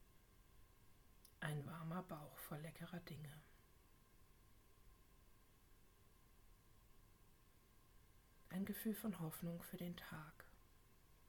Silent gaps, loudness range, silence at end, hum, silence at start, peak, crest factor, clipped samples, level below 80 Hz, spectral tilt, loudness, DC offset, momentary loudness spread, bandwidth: none; 10 LU; 0 s; none; 0 s; -32 dBFS; 24 dB; under 0.1%; -72 dBFS; -6 dB/octave; -51 LUFS; under 0.1%; 16 LU; 19 kHz